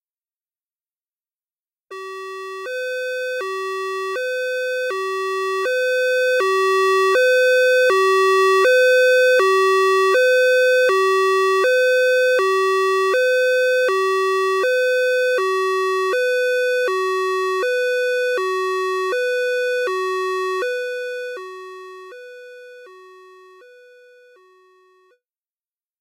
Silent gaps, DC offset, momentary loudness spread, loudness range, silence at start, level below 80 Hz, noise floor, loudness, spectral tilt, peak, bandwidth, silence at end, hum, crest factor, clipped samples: none; under 0.1%; 13 LU; 13 LU; 1.9 s; -84 dBFS; under -90 dBFS; -18 LUFS; 0 dB/octave; -6 dBFS; 16 kHz; 3 s; none; 12 dB; under 0.1%